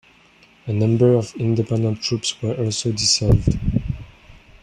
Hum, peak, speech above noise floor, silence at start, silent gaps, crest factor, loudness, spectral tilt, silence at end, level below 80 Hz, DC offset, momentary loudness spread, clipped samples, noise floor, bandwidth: none; -4 dBFS; 33 dB; 0.65 s; none; 18 dB; -20 LUFS; -5 dB/octave; 0.25 s; -34 dBFS; under 0.1%; 10 LU; under 0.1%; -52 dBFS; 10.5 kHz